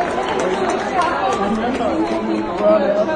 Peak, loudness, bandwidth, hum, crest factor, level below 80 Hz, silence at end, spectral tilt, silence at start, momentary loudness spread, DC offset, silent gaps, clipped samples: -2 dBFS; -18 LUFS; 10.5 kHz; none; 16 dB; -44 dBFS; 0 s; -5 dB/octave; 0 s; 4 LU; under 0.1%; none; under 0.1%